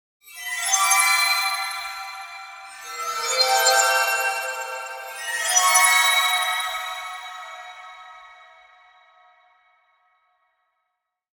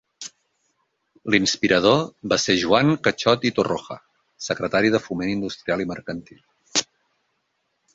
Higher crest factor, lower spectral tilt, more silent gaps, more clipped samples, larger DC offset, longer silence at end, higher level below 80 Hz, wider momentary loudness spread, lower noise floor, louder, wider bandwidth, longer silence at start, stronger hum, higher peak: about the same, 20 dB vs 20 dB; second, 5 dB/octave vs -4 dB/octave; neither; neither; neither; first, 3.05 s vs 1.1 s; second, -72 dBFS vs -56 dBFS; first, 21 LU vs 18 LU; first, -79 dBFS vs -73 dBFS; about the same, -19 LUFS vs -21 LUFS; first, 19 kHz vs 8 kHz; about the same, 0.25 s vs 0.2 s; neither; about the same, -4 dBFS vs -2 dBFS